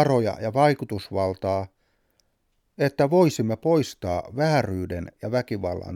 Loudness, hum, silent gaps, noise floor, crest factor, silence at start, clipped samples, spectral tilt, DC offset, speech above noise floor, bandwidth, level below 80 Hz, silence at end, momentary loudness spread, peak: -24 LUFS; none; none; -71 dBFS; 18 dB; 0 s; under 0.1%; -6.5 dB/octave; under 0.1%; 47 dB; 16.5 kHz; -54 dBFS; 0 s; 9 LU; -6 dBFS